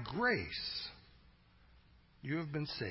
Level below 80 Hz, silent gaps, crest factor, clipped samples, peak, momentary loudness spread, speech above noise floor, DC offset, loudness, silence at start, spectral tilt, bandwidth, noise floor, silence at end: -62 dBFS; none; 18 dB; under 0.1%; -22 dBFS; 15 LU; 27 dB; under 0.1%; -38 LUFS; 0 s; -8.5 dB/octave; 5.8 kHz; -65 dBFS; 0 s